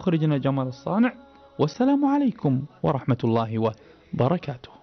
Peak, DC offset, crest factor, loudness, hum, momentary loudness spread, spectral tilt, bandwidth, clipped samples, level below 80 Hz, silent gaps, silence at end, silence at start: -10 dBFS; under 0.1%; 14 dB; -24 LUFS; none; 7 LU; -8.5 dB/octave; 6.4 kHz; under 0.1%; -58 dBFS; none; 0.15 s; 0 s